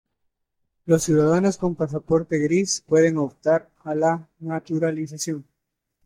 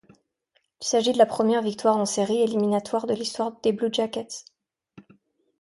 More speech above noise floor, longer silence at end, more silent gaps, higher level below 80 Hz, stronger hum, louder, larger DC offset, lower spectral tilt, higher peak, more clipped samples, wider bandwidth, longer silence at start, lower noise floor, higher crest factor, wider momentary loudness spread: first, 58 dB vs 47 dB; about the same, 0.65 s vs 0.6 s; neither; first, -56 dBFS vs -70 dBFS; neither; about the same, -22 LUFS vs -24 LUFS; neither; first, -5.5 dB/octave vs -4 dB/octave; about the same, -6 dBFS vs -6 dBFS; neither; first, 15.5 kHz vs 11.5 kHz; about the same, 0.85 s vs 0.8 s; first, -80 dBFS vs -71 dBFS; about the same, 16 dB vs 20 dB; about the same, 11 LU vs 10 LU